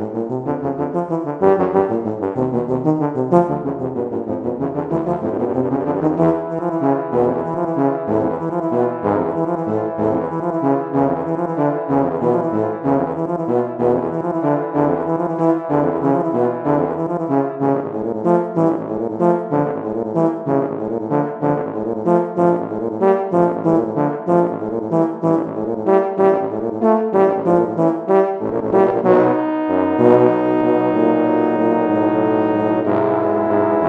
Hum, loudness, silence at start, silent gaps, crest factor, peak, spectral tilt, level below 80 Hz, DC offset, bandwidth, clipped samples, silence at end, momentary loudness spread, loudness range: none; -18 LUFS; 0 s; none; 18 dB; 0 dBFS; -10 dB/octave; -54 dBFS; under 0.1%; 4.8 kHz; under 0.1%; 0 s; 6 LU; 4 LU